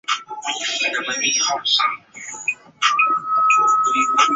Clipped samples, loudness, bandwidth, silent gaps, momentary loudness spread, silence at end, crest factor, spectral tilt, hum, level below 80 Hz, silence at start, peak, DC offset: under 0.1%; -18 LUFS; 8 kHz; none; 10 LU; 0 s; 16 dB; 1 dB/octave; none; -70 dBFS; 0.1 s; -2 dBFS; under 0.1%